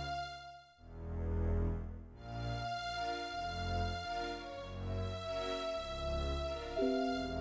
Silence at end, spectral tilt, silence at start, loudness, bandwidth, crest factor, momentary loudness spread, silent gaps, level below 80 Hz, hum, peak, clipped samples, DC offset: 0 s; -6 dB/octave; 0 s; -40 LUFS; 8 kHz; 16 dB; 12 LU; none; -44 dBFS; none; -24 dBFS; under 0.1%; under 0.1%